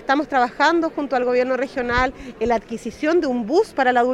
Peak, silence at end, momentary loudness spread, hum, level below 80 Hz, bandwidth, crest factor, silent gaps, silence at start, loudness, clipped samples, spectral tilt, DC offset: -4 dBFS; 0 s; 6 LU; none; -42 dBFS; 12 kHz; 16 dB; none; 0 s; -20 LUFS; under 0.1%; -5 dB/octave; under 0.1%